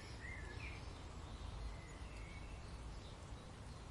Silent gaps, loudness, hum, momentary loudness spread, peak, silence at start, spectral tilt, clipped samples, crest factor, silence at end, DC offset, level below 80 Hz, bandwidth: none; -52 LUFS; none; 4 LU; -38 dBFS; 0 s; -5 dB/octave; under 0.1%; 14 dB; 0 s; under 0.1%; -54 dBFS; 11.5 kHz